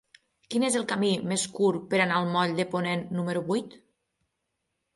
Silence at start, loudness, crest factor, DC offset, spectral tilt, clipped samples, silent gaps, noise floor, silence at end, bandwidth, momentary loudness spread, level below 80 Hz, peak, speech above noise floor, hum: 0.5 s; -27 LUFS; 18 dB; under 0.1%; -4.5 dB/octave; under 0.1%; none; -81 dBFS; 1.2 s; 11.5 kHz; 6 LU; -70 dBFS; -12 dBFS; 54 dB; none